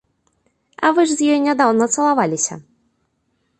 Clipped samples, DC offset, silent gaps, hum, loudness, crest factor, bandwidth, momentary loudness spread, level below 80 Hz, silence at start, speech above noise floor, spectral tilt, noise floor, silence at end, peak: under 0.1%; under 0.1%; none; none; -17 LUFS; 16 dB; 11 kHz; 6 LU; -66 dBFS; 0.8 s; 51 dB; -3.5 dB/octave; -67 dBFS; 1 s; -2 dBFS